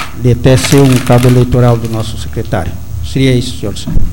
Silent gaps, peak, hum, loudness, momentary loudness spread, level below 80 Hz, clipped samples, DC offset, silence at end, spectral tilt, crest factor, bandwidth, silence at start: none; 0 dBFS; none; -10 LUFS; 12 LU; -22 dBFS; 0.2%; 9%; 0 s; -6 dB/octave; 10 dB; 17 kHz; 0 s